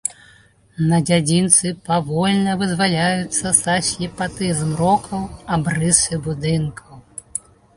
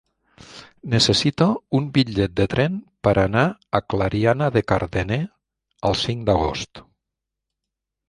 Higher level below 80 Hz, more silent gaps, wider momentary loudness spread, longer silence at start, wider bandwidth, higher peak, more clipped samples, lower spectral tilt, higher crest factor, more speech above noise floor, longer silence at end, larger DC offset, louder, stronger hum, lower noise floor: second, -46 dBFS vs -40 dBFS; neither; first, 13 LU vs 9 LU; second, 0.05 s vs 0.5 s; about the same, 11.5 kHz vs 11.5 kHz; about the same, 0 dBFS vs -2 dBFS; neither; second, -4 dB/octave vs -5.5 dB/octave; about the same, 20 dB vs 20 dB; second, 32 dB vs 63 dB; second, 0.4 s vs 1.3 s; neither; first, -18 LUFS vs -21 LUFS; neither; second, -51 dBFS vs -84 dBFS